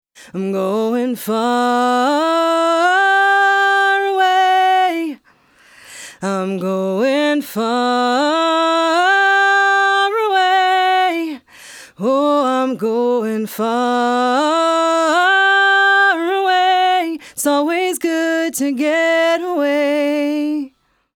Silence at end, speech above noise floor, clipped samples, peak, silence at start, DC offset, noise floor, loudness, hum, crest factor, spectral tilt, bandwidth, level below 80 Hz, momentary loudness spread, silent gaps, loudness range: 0.5 s; 36 dB; under 0.1%; -4 dBFS; 0.2 s; under 0.1%; -52 dBFS; -15 LUFS; none; 12 dB; -3.5 dB/octave; 18.5 kHz; -72 dBFS; 9 LU; none; 4 LU